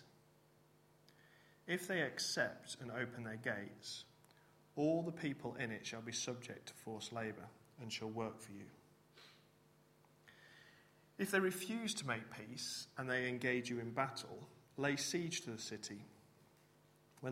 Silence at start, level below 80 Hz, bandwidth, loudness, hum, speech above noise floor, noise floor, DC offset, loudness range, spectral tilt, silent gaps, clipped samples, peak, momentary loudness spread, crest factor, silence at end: 0 s; -82 dBFS; 16 kHz; -42 LUFS; none; 28 dB; -70 dBFS; under 0.1%; 8 LU; -3.5 dB/octave; none; under 0.1%; -22 dBFS; 21 LU; 24 dB; 0 s